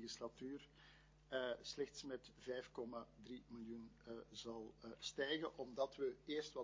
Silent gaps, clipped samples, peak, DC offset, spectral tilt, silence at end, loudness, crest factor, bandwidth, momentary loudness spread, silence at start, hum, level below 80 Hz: none; under 0.1%; -30 dBFS; under 0.1%; -3.5 dB/octave; 0 s; -49 LUFS; 20 dB; 7.6 kHz; 13 LU; 0 s; none; -74 dBFS